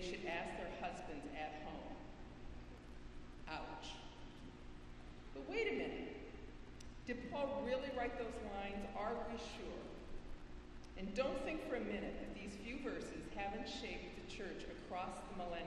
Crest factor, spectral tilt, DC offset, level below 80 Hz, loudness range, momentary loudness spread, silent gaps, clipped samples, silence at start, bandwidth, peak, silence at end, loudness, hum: 20 dB; -5 dB/octave; under 0.1%; -58 dBFS; 7 LU; 15 LU; none; under 0.1%; 0 s; 12 kHz; -26 dBFS; 0 s; -47 LUFS; 60 Hz at -65 dBFS